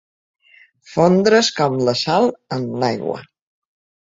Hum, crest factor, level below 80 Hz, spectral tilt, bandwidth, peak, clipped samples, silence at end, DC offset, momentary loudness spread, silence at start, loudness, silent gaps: none; 18 dB; -60 dBFS; -5 dB/octave; 7.8 kHz; 0 dBFS; under 0.1%; 0.9 s; under 0.1%; 13 LU; 0.9 s; -17 LUFS; none